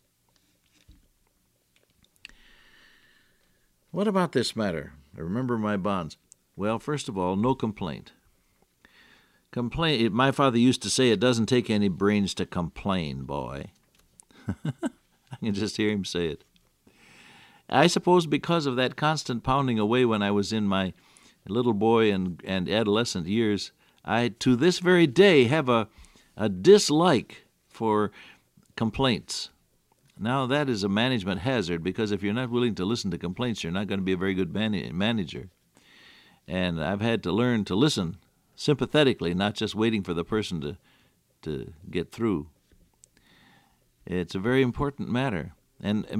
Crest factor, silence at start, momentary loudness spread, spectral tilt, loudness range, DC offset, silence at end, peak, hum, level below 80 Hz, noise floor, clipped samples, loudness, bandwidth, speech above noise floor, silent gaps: 22 dB; 0.9 s; 13 LU; -5.5 dB/octave; 9 LU; under 0.1%; 0 s; -6 dBFS; none; -56 dBFS; -69 dBFS; under 0.1%; -26 LUFS; 14.5 kHz; 44 dB; none